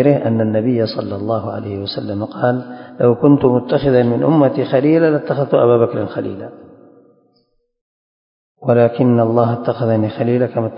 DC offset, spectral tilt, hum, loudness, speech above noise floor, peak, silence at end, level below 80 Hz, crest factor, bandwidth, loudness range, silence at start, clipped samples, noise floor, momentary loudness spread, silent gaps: under 0.1%; -11.5 dB/octave; none; -15 LUFS; 47 dB; 0 dBFS; 0 s; -50 dBFS; 16 dB; 5.4 kHz; 6 LU; 0 s; under 0.1%; -62 dBFS; 11 LU; 7.81-8.55 s